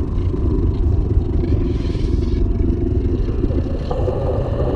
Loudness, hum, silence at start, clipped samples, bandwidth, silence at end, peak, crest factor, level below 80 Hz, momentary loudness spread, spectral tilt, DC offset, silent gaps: -20 LUFS; none; 0 s; under 0.1%; 6.4 kHz; 0 s; -4 dBFS; 12 dB; -20 dBFS; 2 LU; -10 dB/octave; under 0.1%; none